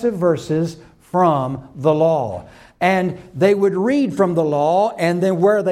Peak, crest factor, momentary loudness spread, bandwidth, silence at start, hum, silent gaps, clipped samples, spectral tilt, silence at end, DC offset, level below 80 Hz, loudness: -2 dBFS; 14 dB; 8 LU; 14 kHz; 0 s; none; none; under 0.1%; -7 dB/octave; 0 s; under 0.1%; -54 dBFS; -18 LUFS